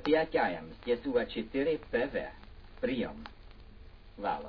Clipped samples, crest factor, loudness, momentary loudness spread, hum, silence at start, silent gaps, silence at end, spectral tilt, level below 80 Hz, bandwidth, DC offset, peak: under 0.1%; 18 dB; -33 LUFS; 14 LU; none; 0 s; none; 0 s; -3.5 dB/octave; -52 dBFS; 5.4 kHz; under 0.1%; -14 dBFS